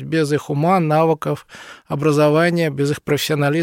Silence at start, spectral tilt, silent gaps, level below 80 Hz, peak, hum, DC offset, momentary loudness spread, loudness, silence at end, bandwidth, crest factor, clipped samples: 0 s; -6 dB/octave; none; -58 dBFS; -4 dBFS; none; under 0.1%; 13 LU; -18 LUFS; 0 s; 16.5 kHz; 14 dB; under 0.1%